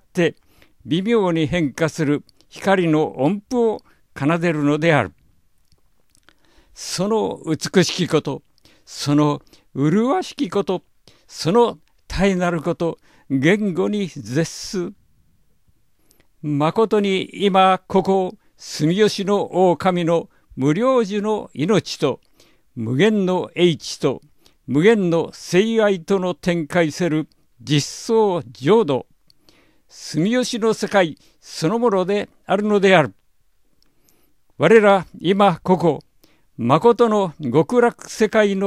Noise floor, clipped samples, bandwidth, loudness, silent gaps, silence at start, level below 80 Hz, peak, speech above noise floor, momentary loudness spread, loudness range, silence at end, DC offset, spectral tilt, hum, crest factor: -63 dBFS; under 0.1%; 14.5 kHz; -19 LUFS; none; 0.15 s; -50 dBFS; 0 dBFS; 45 dB; 10 LU; 5 LU; 0 s; 0.1%; -5.5 dB/octave; none; 20 dB